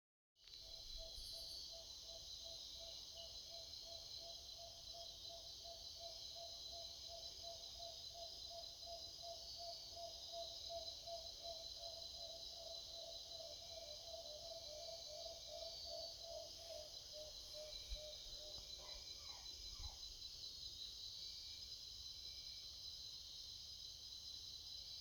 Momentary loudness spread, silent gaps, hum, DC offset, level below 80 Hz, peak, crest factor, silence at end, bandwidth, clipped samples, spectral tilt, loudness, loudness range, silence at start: 2 LU; none; none; under 0.1%; -66 dBFS; -36 dBFS; 18 dB; 0 s; 19 kHz; under 0.1%; -1 dB/octave; -51 LUFS; 2 LU; 0.35 s